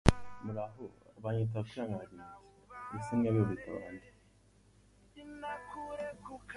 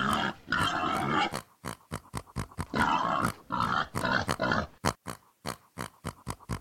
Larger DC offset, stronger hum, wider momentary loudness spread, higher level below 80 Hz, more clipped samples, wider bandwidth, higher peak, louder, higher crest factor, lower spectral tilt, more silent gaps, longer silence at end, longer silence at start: neither; first, 50 Hz at -60 dBFS vs none; first, 21 LU vs 14 LU; about the same, -48 dBFS vs -50 dBFS; neither; second, 11.5 kHz vs 17 kHz; first, -4 dBFS vs -10 dBFS; second, -38 LUFS vs -31 LUFS; first, 34 dB vs 22 dB; first, -7 dB/octave vs -4.5 dB/octave; neither; about the same, 0 s vs 0 s; about the same, 0.05 s vs 0 s